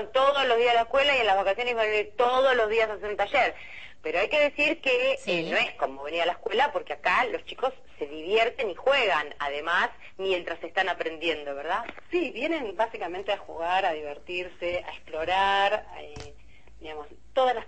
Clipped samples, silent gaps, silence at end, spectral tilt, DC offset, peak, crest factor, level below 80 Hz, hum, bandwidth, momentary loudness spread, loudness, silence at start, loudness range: under 0.1%; none; 0 s; -3.5 dB/octave; 0.5%; -10 dBFS; 16 dB; -58 dBFS; none; 8.6 kHz; 12 LU; -26 LUFS; 0 s; 6 LU